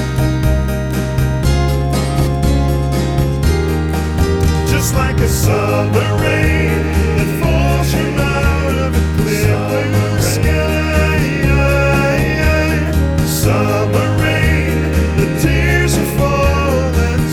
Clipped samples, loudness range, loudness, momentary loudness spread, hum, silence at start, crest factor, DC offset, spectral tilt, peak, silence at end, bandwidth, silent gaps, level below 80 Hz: under 0.1%; 2 LU; -14 LUFS; 3 LU; none; 0 s; 14 dB; 0.3%; -6 dB/octave; 0 dBFS; 0 s; 17 kHz; none; -20 dBFS